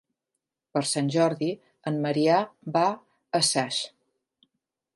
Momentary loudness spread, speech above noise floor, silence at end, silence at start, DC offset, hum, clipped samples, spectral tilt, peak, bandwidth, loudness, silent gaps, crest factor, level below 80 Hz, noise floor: 9 LU; 59 dB; 1.1 s; 0.75 s; under 0.1%; none; under 0.1%; -4 dB/octave; -8 dBFS; 11.5 kHz; -26 LUFS; none; 20 dB; -76 dBFS; -84 dBFS